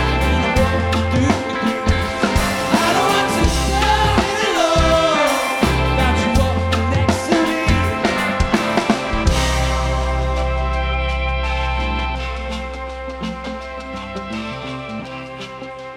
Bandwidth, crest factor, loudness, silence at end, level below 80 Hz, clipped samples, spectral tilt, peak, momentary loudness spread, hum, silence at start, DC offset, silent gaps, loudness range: 17 kHz; 14 dB; -18 LUFS; 0 s; -24 dBFS; under 0.1%; -5 dB/octave; -4 dBFS; 13 LU; none; 0 s; under 0.1%; none; 9 LU